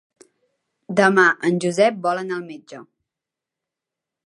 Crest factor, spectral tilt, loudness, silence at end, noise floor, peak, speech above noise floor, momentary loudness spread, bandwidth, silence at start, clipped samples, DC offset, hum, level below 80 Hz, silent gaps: 22 dB; -5 dB/octave; -19 LUFS; 1.45 s; -86 dBFS; -2 dBFS; 67 dB; 16 LU; 11.5 kHz; 0.9 s; under 0.1%; under 0.1%; none; -70 dBFS; none